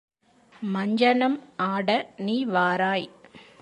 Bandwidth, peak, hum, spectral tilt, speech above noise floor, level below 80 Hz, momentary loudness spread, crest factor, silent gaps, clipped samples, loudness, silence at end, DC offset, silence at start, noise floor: 9.8 kHz; -8 dBFS; none; -6.5 dB/octave; 33 dB; -76 dBFS; 9 LU; 18 dB; none; under 0.1%; -24 LUFS; 0.2 s; under 0.1%; 0.6 s; -57 dBFS